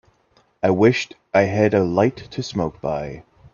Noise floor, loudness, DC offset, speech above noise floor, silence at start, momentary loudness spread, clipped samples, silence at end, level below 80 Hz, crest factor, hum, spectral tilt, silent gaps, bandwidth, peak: -60 dBFS; -20 LUFS; under 0.1%; 41 dB; 0.65 s; 12 LU; under 0.1%; 0.35 s; -52 dBFS; 20 dB; none; -6.5 dB/octave; none; 7.2 kHz; 0 dBFS